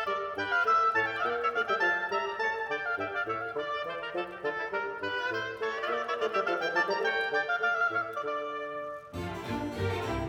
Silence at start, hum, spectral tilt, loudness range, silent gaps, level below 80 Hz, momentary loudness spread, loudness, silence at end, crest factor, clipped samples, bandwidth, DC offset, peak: 0 s; none; -5 dB/octave; 4 LU; none; -58 dBFS; 8 LU; -30 LUFS; 0 s; 16 dB; under 0.1%; 17 kHz; under 0.1%; -14 dBFS